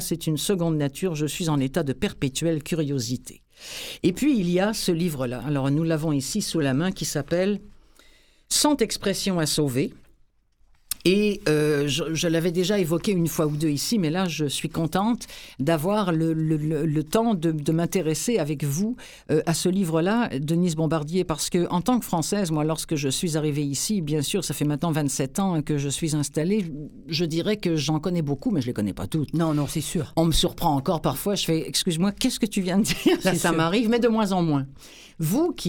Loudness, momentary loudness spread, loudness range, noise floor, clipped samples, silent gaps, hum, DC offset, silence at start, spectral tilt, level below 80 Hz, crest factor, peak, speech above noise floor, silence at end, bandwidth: -24 LUFS; 5 LU; 3 LU; -60 dBFS; under 0.1%; none; none; under 0.1%; 0 s; -5 dB/octave; -46 dBFS; 20 dB; -4 dBFS; 36 dB; 0 s; 19 kHz